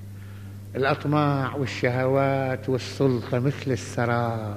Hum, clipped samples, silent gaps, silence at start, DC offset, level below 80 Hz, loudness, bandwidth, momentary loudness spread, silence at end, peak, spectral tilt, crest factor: none; under 0.1%; none; 0 s; under 0.1%; -56 dBFS; -25 LUFS; 15 kHz; 12 LU; 0 s; -6 dBFS; -7 dB/octave; 18 dB